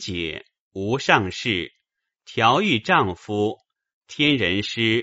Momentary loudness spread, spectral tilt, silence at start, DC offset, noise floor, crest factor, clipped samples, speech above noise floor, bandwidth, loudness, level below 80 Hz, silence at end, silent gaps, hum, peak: 17 LU; -2.5 dB/octave; 0 s; under 0.1%; -78 dBFS; 22 dB; under 0.1%; 56 dB; 8 kHz; -21 LUFS; -54 dBFS; 0 s; 0.60-0.71 s, 3.94-4.01 s; none; 0 dBFS